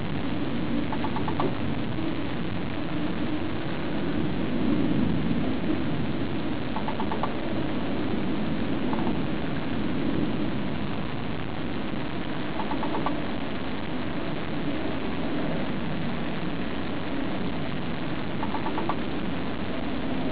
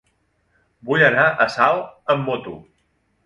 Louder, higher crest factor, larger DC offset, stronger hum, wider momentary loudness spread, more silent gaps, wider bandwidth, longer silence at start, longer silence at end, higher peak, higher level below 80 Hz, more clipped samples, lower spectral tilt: second, -30 LUFS vs -18 LUFS; about the same, 16 dB vs 20 dB; first, 4% vs under 0.1%; neither; second, 4 LU vs 22 LU; neither; second, 4 kHz vs 11.5 kHz; second, 0 s vs 0.85 s; second, 0 s vs 0.7 s; second, -12 dBFS vs 0 dBFS; first, -44 dBFS vs -58 dBFS; neither; first, -10.5 dB/octave vs -6 dB/octave